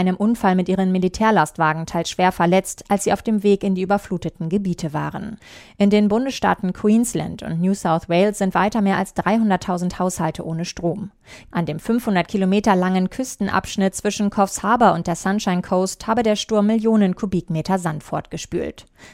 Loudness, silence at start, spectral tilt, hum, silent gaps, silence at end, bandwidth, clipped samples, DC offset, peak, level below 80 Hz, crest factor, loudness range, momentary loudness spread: -20 LUFS; 0 s; -5.5 dB/octave; none; none; 0.05 s; 15.5 kHz; under 0.1%; under 0.1%; -2 dBFS; -48 dBFS; 18 dB; 3 LU; 9 LU